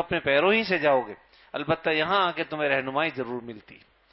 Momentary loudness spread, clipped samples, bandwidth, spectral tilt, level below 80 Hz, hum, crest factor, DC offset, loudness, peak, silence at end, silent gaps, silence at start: 16 LU; under 0.1%; 5.8 kHz; -9 dB/octave; -60 dBFS; none; 18 dB; under 0.1%; -25 LUFS; -8 dBFS; 0.4 s; none; 0 s